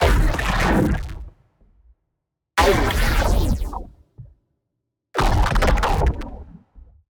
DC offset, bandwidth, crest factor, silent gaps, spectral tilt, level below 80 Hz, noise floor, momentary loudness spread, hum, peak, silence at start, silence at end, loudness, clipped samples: under 0.1%; over 20 kHz; 16 dB; none; -5.5 dB/octave; -24 dBFS; -79 dBFS; 17 LU; none; -4 dBFS; 0 s; 0.35 s; -21 LUFS; under 0.1%